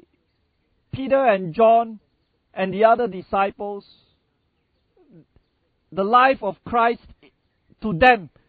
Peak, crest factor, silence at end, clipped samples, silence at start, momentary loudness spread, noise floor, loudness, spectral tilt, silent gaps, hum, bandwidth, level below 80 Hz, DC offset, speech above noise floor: 0 dBFS; 22 dB; 0.2 s; under 0.1%; 0.95 s; 16 LU; -69 dBFS; -19 LUFS; -8 dB/octave; none; none; 4.9 kHz; -52 dBFS; under 0.1%; 50 dB